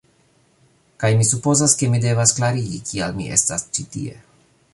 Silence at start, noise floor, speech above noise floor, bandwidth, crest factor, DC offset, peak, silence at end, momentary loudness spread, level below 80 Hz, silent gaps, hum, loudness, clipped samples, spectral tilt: 1 s; -59 dBFS; 40 dB; 11.5 kHz; 20 dB; under 0.1%; -2 dBFS; 0.6 s; 11 LU; -50 dBFS; none; none; -18 LUFS; under 0.1%; -4 dB/octave